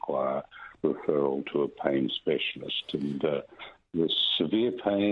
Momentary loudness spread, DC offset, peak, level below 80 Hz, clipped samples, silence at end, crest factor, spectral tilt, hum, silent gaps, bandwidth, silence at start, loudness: 10 LU; under 0.1%; -10 dBFS; -68 dBFS; under 0.1%; 0 s; 18 dB; -7 dB/octave; none; none; 6.4 kHz; 0.05 s; -29 LUFS